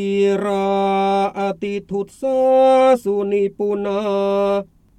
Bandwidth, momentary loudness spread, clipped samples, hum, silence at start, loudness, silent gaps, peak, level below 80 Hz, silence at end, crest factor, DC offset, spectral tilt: 12.5 kHz; 11 LU; under 0.1%; none; 0 s; -18 LUFS; none; -4 dBFS; -56 dBFS; 0.35 s; 14 dB; under 0.1%; -6.5 dB/octave